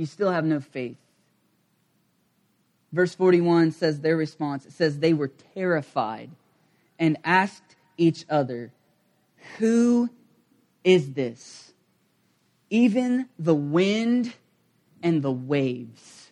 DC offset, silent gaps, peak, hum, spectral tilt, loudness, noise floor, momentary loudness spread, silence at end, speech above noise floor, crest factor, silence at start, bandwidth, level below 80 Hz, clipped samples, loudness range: under 0.1%; none; -4 dBFS; none; -6.5 dB/octave; -24 LUFS; -68 dBFS; 13 LU; 0.4 s; 45 dB; 20 dB; 0 s; 10.5 kHz; -72 dBFS; under 0.1%; 3 LU